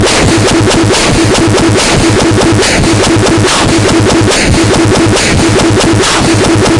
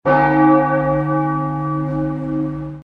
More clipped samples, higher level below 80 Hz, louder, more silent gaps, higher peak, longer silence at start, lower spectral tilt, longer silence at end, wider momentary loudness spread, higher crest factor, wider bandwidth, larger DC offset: first, 0.2% vs under 0.1%; first, -22 dBFS vs -42 dBFS; first, -7 LUFS vs -17 LUFS; neither; about the same, 0 dBFS vs -2 dBFS; about the same, 0 s vs 0.05 s; second, -4.5 dB/octave vs -10 dB/octave; about the same, 0 s vs 0 s; second, 0 LU vs 9 LU; second, 6 dB vs 16 dB; first, 11.5 kHz vs 4.9 kHz; first, 0.7% vs under 0.1%